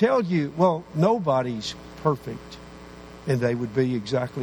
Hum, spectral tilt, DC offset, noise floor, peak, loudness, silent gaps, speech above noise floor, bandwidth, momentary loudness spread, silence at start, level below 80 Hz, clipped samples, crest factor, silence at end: none; -7 dB/octave; under 0.1%; -43 dBFS; -6 dBFS; -24 LUFS; none; 19 dB; 19 kHz; 20 LU; 0 s; -54 dBFS; under 0.1%; 18 dB; 0 s